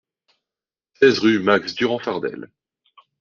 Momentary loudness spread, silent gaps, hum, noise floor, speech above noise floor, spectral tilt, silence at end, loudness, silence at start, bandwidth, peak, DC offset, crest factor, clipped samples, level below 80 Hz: 13 LU; none; none; under -90 dBFS; over 71 dB; -5 dB/octave; 0.75 s; -19 LUFS; 1 s; 7.2 kHz; -2 dBFS; under 0.1%; 20 dB; under 0.1%; -64 dBFS